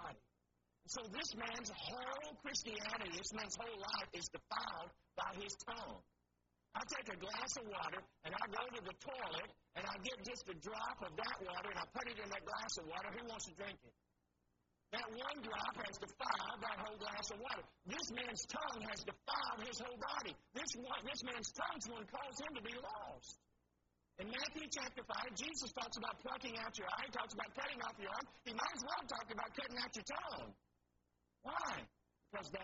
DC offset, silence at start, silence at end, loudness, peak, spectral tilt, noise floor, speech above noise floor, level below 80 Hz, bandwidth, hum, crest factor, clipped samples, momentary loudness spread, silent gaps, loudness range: under 0.1%; 0 s; 0 s; -46 LUFS; -24 dBFS; -1 dB/octave; -84 dBFS; 37 dB; -72 dBFS; 7.6 kHz; 60 Hz at -75 dBFS; 24 dB; under 0.1%; 6 LU; none; 3 LU